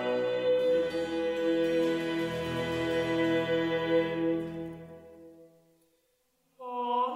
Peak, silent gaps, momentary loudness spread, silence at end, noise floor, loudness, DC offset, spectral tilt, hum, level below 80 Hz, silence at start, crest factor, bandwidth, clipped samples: -16 dBFS; none; 13 LU; 0 s; -73 dBFS; -30 LUFS; under 0.1%; -6 dB/octave; none; -62 dBFS; 0 s; 14 dB; 14 kHz; under 0.1%